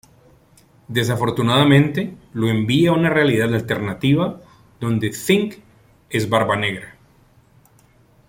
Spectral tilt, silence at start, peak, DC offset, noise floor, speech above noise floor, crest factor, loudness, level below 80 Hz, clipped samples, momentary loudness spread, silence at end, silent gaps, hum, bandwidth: -6 dB/octave; 0.9 s; -2 dBFS; under 0.1%; -54 dBFS; 36 dB; 18 dB; -19 LUFS; -52 dBFS; under 0.1%; 10 LU; 1.4 s; none; none; 16.5 kHz